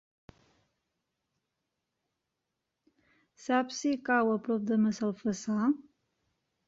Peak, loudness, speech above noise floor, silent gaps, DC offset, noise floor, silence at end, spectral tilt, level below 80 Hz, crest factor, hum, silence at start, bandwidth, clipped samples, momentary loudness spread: -14 dBFS; -30 LUFS; 56 dB; none; under 0.1%; -86 dBFS; 0.85 s; -5.5 dB/octave; -74 dBFS; 20 dB; none; 3.4 s; 7.8 kHz; under 0.1%; 6 LU